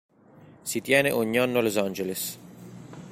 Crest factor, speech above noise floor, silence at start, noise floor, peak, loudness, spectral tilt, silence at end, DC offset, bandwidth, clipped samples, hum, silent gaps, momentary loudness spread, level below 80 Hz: 22 dB; 27 dB; 0.4 s; -53 dBFS; -6 dBFS; -25 LUFS; -4 dB/octave; 0 s; under 0.1%; 16.5 kHz; under 0.1%; none; none; 22 LU; -66 dBFS